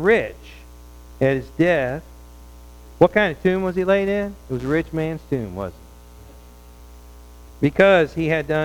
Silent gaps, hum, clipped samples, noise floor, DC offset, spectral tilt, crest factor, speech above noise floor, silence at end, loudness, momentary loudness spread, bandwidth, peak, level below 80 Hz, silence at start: none; 60 Hz at -45 dBFS; under 0.1%; -43 dBFS; under 0.1%; -7 dB/octave; 20 dB; 24 dB; 0 s; -20 LUFS; 14 LU; 18.5 kHz; 0 dBFS; -42 dBFS; 0 s